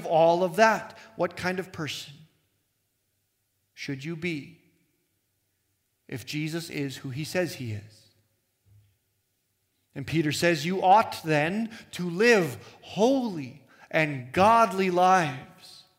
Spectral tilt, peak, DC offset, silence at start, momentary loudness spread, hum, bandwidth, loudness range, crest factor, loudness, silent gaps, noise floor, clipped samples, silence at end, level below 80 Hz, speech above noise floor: -5 dB/octave; -6 dBFS; under 0.1%; 0 s; 18 LU; none; 16 kHz; 15 LU; 22 dB; -25 LUFS; none; -75 dBFS; under 0.1%; 0.25 s; -68 dBFS; 50 dB